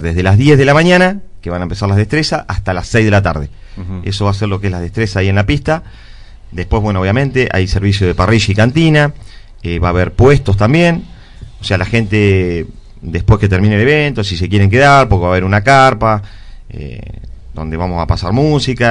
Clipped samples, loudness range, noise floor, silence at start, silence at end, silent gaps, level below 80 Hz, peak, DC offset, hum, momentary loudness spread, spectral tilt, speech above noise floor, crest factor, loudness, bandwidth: 0.7%; 5 LU; -32 dBFS; 0 s; 0 s; none; -28 dBFS; 0 dBFS; under 0.1%; none; 17 LU; -6.5 dB/octave; 21 dB; 12 dB; -12 LUFS; 10.5 kHz